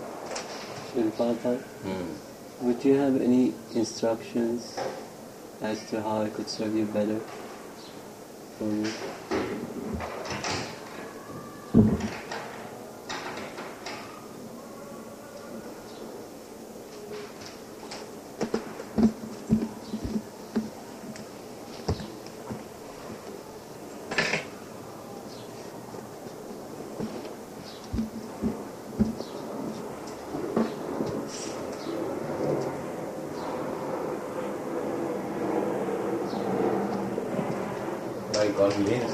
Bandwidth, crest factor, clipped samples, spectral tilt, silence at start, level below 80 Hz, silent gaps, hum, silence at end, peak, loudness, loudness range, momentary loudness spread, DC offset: 15 kHz; 24 dB; under 0.1%; -5.5 dB/octave; 0 s; -54 dBFS; none; none; 0 s; -8 dBFS; -31 LUFS; 12 LU; 16 LU; under 0.1%